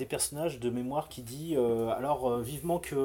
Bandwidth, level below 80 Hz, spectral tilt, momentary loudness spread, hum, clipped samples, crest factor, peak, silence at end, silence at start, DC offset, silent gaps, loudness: 17 kHz; -56 dBFS; -5 dB/octave; 6 LU; none; under 0.1%; 16 dB; -16 dBFS; 0 s; 0 s; under 0.1%; none; -32 LUFS